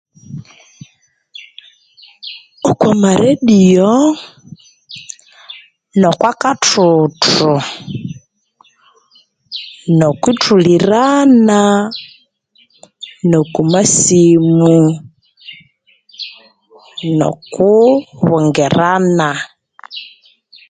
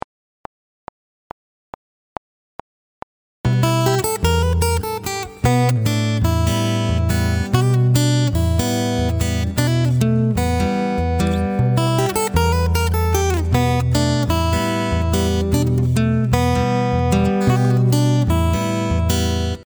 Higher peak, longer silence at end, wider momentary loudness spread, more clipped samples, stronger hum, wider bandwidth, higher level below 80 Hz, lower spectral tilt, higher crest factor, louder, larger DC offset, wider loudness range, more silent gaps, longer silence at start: about the same, 0 dBFS vs 0 dBFS; first, 0.65 s vs 0 s; first, 23 LU vs 4 LU; neither; neither; second, 9.6 kHz vs over 20 kHz; second, -52 dBFS vs -28 dBFS; about the same, -5 dB/octave vs -6 dB/octave; about the same, 14 dB vs 18 dB; first, -11 LUFS vs -18 LUFS; neither; about the same, 5 LU vs 3 LU; neither; second, 0.3 s vs 3.45 s